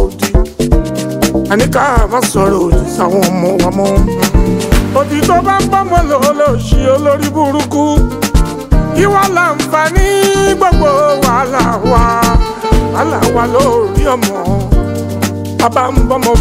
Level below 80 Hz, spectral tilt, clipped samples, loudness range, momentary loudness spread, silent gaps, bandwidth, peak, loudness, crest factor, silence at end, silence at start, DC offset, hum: -16 dBFS; -5.5 dB/octave; under 0.1%; 2 LU; 4 LU; none; 16.5 kHz; 0 dBFS; -11 LUFS; 10 dB; 0 s; 0 s; under 0.1%; none